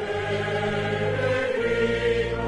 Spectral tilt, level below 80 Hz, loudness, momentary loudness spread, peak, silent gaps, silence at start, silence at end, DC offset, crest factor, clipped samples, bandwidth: -6 dB/octave; -42 dBFS; -25 LUFS; 3 LU; -12 dBFS; none; 0 s; 0 s; under 0.1%; 12 dB; under 0.1%; 11.5 kHz